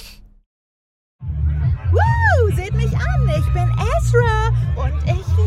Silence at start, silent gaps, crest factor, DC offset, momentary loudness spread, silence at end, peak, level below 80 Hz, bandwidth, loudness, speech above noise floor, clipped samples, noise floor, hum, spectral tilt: 0 s; 0.46-1.19 s; 16 dB; under 0.1%; 6 LU; 0 s; -2 dBFS; -24 dBFS; 12.5 kHz; -18 LUFS; over 74 dB; under 0.1%; under -90 dBFS; none; -7 dB/octave